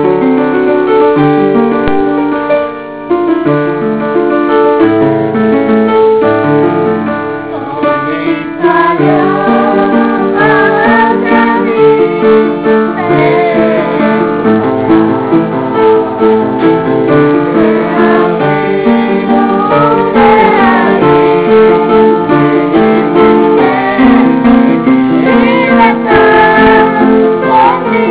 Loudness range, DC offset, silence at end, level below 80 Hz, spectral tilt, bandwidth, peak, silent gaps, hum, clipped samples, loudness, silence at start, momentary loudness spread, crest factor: 4 LU; 0.4%; 0 s; -38 dBFS; -10.5 dB/octave; 4 kHz; 0 dBFS; none; none; 2%; -8 LUFS; 0 s; 5 LU; 8 dB